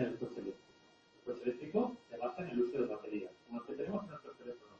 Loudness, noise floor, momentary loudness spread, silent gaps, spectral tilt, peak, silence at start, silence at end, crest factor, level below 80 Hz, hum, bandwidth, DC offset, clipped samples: -41 LUFS; -66 dBFS; 14 LU; none; -8 dB/octave; -20 dBFS; 0 s; 0 s; 20 dB; -76 dBFS; none; 7.4 kHz; under 0.1%; under 0.1%